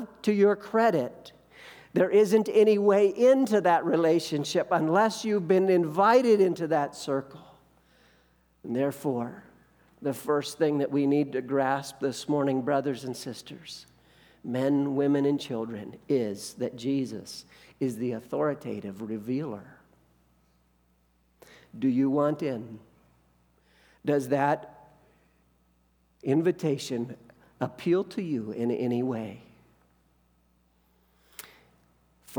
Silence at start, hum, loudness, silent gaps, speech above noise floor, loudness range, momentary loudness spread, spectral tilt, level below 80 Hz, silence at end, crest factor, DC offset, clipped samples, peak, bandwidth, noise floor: 0 s; none; -27 LUFS; none; 41 dB; 11 LU; 17 LU; -6 dB/octave; -70 dBFS; 0 s; 20 dB; under 0.1%; under 0.1%; -8 dBFS; over 20 kHz; -67 dBFS